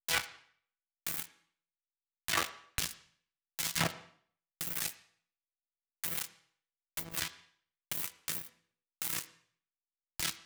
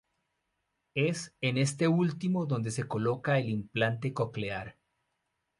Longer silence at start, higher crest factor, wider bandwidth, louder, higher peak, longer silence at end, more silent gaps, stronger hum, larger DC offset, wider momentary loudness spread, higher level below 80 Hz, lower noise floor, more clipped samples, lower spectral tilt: second, 0.1 s vs 0.95 s; first, 28 dB vs 18 dB; first, over 20 kHz vs 11.5 kHz; second, -36 LUFS vs -31 LUFS; about the same, -14 dBFS vs -14 dBFS; second, 0 s vs 0.9 s; neither; neither; neither; first, 15 LU vs 9 LU; about the same, -62 dBFS vs -66 dBFS; first, under -90 dBFS vs -81 dBFS; neither; second, -1 dB/octave vs -6 dB/octave